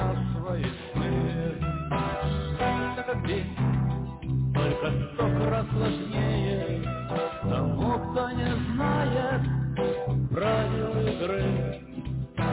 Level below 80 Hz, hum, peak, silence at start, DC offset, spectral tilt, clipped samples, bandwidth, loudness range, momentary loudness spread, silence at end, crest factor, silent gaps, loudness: -40 dBFS; none; -16 dBFS; 0 s; under 0.1%; -11.5 dB/octave; under 0.1%; 4 kHz; 2 LU; 5 LU; 0 s; 10 dB; none; -28 LUFS